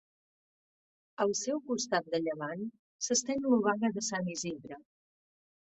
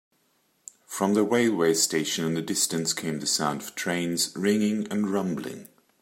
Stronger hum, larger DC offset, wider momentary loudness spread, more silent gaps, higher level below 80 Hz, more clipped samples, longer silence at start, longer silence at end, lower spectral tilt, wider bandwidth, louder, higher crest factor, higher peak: neither; neither; first, 15 LU vs 9 LU; first, 2.79-2.99 s vs none; about the same, -76 dBFS vs -72 dBFS; neither; first, 1.2 s vs 0.9 s; first, 0.85 s vs 0.35 s; about the same, -3.5 dB/octave vs -3.5 dB/octave; second, 8.4 kHz vs 16.5 kHz; second, -32 LUFS vs -25 LUFS; about the same, 20 dB vs 18 dB; second, -14 dBFS vs -8 dBFS